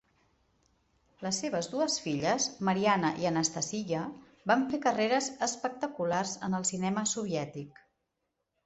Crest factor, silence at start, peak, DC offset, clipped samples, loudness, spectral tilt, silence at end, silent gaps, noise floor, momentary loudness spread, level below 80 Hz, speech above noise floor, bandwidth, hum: 22 dB; 1.2 s; -12 dBFS; under 0.1%; under 0.1%; -31 LUFS; -3.5 dB/octave; 0.95 s; none; -83 dBFS; 8 LU; -70 dBFS; 52 dB; 8.4 kHz; none